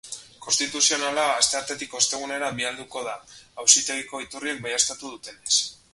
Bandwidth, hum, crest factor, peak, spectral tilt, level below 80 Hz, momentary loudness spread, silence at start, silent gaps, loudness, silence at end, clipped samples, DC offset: 12 kHz; none; 26 dB; 0 dBFS; 0.5 dB/octave; -64 dBFS; 18 LU; 0.05 s; none; -22 LUFS; 0.2 s; under 0.1%; under 0.1%